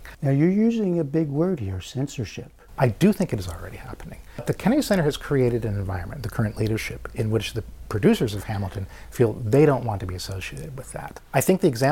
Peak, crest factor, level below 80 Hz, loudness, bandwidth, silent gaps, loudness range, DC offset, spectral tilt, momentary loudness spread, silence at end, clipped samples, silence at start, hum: -6 dBFS; 18 dB; -44 dBFS; -24 LUFS; 17 kHz; none; 3 LU; under 0.1%; -6.5 dB/octave; 16 LU; 0 s; under 0.1%; 0 s; none